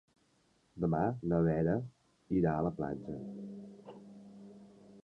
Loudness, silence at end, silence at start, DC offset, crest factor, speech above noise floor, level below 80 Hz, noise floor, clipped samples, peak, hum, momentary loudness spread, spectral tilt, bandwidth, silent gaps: -34 LUFS; 0.05 s; 0.75 s; under 0.1%; 18 dB; 39 dB; -58 dBFS; -72 dBFS; under 0.1%; -18 dBFS; none; 22 LU; -10.5 dB/octave; 5.6 kHz; none